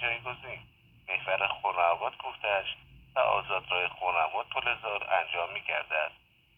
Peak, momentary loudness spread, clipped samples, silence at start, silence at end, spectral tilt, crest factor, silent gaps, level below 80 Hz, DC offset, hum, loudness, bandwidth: -10 dBFS; 11 LU; under 0.1%; 0 s; 0.45 s; -5 dB/octave; 20 dB; none; -64 dBFS; under 0.1%; none; -30 LUFS; 4 kHz